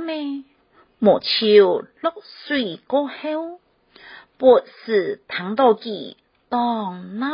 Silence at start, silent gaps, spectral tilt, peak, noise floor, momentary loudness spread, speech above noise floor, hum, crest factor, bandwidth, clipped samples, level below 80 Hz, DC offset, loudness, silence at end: 0 s; none; -9.5 dB/octave; -2 dBFS; -54 dBFS; 16 LU; 35 dB; none; 20 dB; 5.4 kHz; under 0.1%; -66 dBFS; under 0.1%; -20 LUFS; 0 s